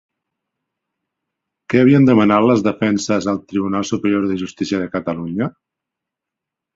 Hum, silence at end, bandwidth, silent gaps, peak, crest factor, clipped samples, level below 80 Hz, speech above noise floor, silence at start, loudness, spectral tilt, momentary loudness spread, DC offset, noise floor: none; 1.25 s; 7.8 kHz; none; -2 dBFS; 16 dB; under 0.1%; -54 dBFS; 68 dB; 1.7 s; -17 LUFS; -6.5 dB/octave; 12 LU; under 0.1%; -84 dBFS